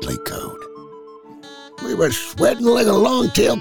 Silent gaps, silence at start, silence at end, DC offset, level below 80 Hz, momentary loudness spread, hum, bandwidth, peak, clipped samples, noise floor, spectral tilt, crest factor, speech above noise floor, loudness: none; 0 s; 0 s; under 0.1%; -46 dBFS; 24 LU; none; over 20 kHz; -4 dBFS; under 0.1%; -40 dBFS; -4.5 dB/octave; 14 dB; 23 dB; -17 LUFS